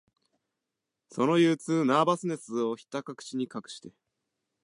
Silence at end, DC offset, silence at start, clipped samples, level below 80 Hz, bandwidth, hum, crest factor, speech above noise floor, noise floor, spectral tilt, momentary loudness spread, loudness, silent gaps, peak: 0.75 s; under 0.1%; 1.15 s; under 0.1%; -84 dBFS; 11.5 kHz; none; 20 dB; 59 dB; -87 dBFS; -6 dB/octave; 17 LU; -28 LUFS; none; -10 dBFS